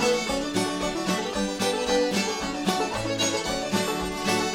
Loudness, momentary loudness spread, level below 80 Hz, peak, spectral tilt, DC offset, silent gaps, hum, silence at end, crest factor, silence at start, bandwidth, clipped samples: -26 LUFS; 4 LU; -48 dBFS; -10 dBFS; -3.5 dB/octave; under 0.1%; none; none; 0 s; 16 dB; 0 s; 17 kHz; under 0.1%